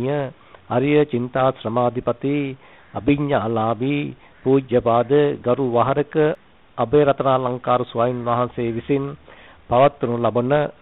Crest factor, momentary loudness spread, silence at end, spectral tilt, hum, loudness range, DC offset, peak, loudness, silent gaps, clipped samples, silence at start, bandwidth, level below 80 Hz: 14 dB; 9 LU; 0.1 s; -6.5 dB/octave; none; 3 LU; 0.1%; -6 dBFS; -20 LUFS; none; under 0.1%; 0 s; 4.1 kHz; -50 dBFS